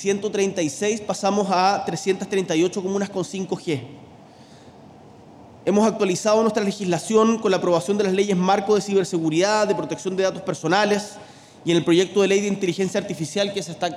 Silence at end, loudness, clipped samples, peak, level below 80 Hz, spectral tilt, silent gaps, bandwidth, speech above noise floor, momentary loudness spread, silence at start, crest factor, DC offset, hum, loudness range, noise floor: 0 s; -21 LUFS; under 0.1%; -6 dBFS; -66 dBFS; -5 dB/octave; none; 13 kHz; 25 dB; 8 LU; 0 s; 16 dB; under 0.1%; none; 6 LU; -46 dBFS